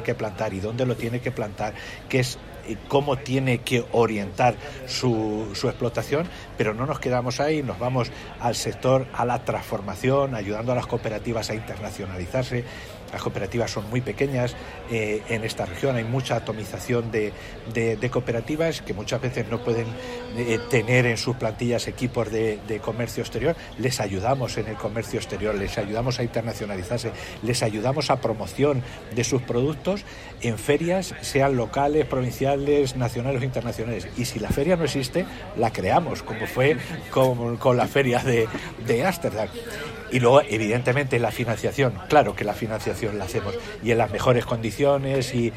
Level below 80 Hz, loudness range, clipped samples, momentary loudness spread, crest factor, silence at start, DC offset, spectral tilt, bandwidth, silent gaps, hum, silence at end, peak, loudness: -46 dBFS; 4 LU; under 0.1%; 9 LU; 22 dB; 0 s; under 0.1%; -5.5 dB/octave; 16 kHz; none; none; 0 s; -2 dBFS; -25 LUFS